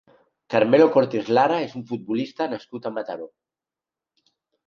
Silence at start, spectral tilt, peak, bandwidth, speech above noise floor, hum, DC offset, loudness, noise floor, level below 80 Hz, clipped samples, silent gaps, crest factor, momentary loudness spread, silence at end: 0.5 s; -7 dB/octave; -4 dBFS; 7 kHz; 68 dB; none; under 0.1%; -22 LUFS; -89 dBFS; -72 dBFS; under 0.1%; none; 20 dB; 16 LU; 1.4 s